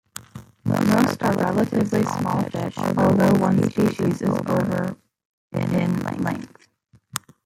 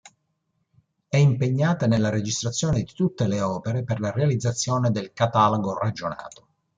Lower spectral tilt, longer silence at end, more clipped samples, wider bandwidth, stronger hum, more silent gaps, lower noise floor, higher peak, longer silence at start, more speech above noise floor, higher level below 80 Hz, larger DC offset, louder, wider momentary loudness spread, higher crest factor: about the same, -7 dB/octave vs -6 dB/octave; second, 0.25 s vs 0.5 s; neither; first, 16.5 kHz vs 9.4 kHz; neither; first, 5.25-5.51 s vs none; second, -58 dBFS vs -74 dBFS; first, -2 dBFS vs -6 dBFS; second, 0.15 s vs 1.1 s; second, 38 dB vs 51 dB; about the same, -56 dBFS vs -54 dBFS; neither; about the same, -22 LUFS vs -23 LUFS; first, 15 LU vs 7 LU; about the same, 20 dB vs 18 dB